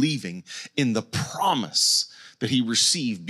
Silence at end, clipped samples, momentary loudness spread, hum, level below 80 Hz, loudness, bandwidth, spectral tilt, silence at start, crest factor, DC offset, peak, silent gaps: 0 s; under 0.1%; 13 LU; none; -66 dBFS; -23 LUFS; 15.5 kHz; -3 dB/octave; 0 s; 16 dB; under 0.1%; -8 dBFS; none